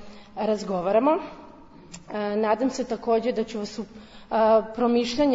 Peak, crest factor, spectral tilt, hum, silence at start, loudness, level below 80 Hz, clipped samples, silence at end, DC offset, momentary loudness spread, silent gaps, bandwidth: -8 dBFS; 16 dB; -5.5 dB/octave; none; 0 s; -24 LUFS; -56 dBFS; under 0.1%; 0 s; under 0.1%; 18 LU; none; 7.8 kHz